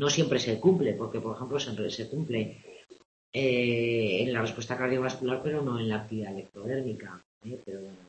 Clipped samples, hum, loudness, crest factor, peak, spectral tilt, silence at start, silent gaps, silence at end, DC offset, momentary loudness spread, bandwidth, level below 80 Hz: under 0.1%; none; -30 LUFS; 20 dB; -10 dBFS; -5 dB/octave; 0 s; 3.05-3.33 s, 7.25-7.41 s; 0 s; under 0.1%; 16 LU; 8.6 kHz; -66 dBFS